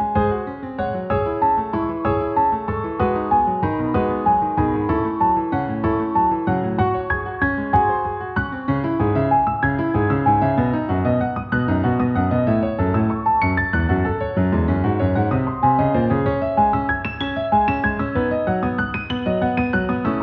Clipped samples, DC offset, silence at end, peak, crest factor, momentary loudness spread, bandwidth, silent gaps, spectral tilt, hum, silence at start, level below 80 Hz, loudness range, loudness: under 0.1%; under 0.1%; 0 s; -4 dBFS; 14 dB; 5 LU; 5.4 kHz; none; -10.5 dB/octave; none; 0 s; -36 dBFS; 1 LU; -20 LUFS